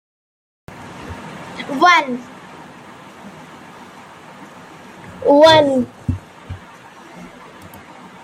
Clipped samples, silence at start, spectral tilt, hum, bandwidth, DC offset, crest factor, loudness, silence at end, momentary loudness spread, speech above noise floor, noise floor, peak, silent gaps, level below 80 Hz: under 0.1%; 0.7 s; -4.5 dB/octave; none; 15.5 kHz; under 0.1%; 20 dB; -14 LUFS; 0.95 s; 27 LU; 28 dB; -40 dBFS; 0 dBFS; none; -48 dBFS